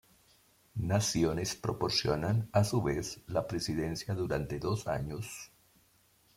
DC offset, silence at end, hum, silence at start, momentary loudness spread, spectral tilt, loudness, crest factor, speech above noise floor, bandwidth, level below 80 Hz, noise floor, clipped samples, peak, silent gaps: under 0.1%; 0.9 s; none; 0.75 s; 10 LU; -5 dB/octave; -33 LUFS; 20 dB; 35 dB; 16 kHz; -54 dBFS; -67 dBFS; under 0.1%; -14 dBFS; none